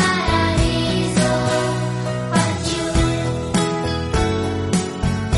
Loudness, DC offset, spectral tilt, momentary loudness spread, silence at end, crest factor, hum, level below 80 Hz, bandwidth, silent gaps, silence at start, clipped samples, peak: -20 LUFS; under 0.1%; -5 dB/octave; 5 LU; 0 s; 14 dB; none; -30 dBFS; 11.5 kHz; none; 0 s; under 0.1%; -4 dBFS